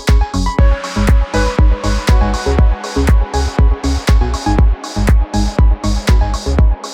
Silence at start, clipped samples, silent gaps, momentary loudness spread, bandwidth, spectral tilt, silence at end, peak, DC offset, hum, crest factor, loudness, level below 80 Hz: 0 s; under 0.1%; none; 3 LU; 12 kHz; -6 dB/octave; 0 s; 0 dBFS; under 0.1%; none; 10 dB; -14 LUFS; -12 dBFS